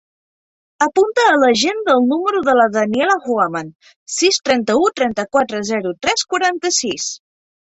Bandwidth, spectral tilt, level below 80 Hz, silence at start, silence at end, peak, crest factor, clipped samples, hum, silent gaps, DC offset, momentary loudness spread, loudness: 8.2 kHz; -2.5 dB/octave; -58 dBFS; 0.8 s; 0.6 s; -2 dBFS; 16 dB; under 0.1%; none; 3.75-3.80 s, 3.96-4.06 s; under 0.1%; 8 LU; -16 LUFS